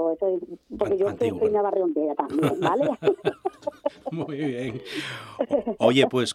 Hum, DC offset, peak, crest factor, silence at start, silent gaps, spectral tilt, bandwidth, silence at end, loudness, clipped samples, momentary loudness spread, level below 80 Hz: none; under 0.1%; -6 dBFS; 20 dB; 0 s; none; -5.5 dB/octave; 14 kHz; 0 s; -25 LUFS; under 0.1%; 11 LU; -62 dBFS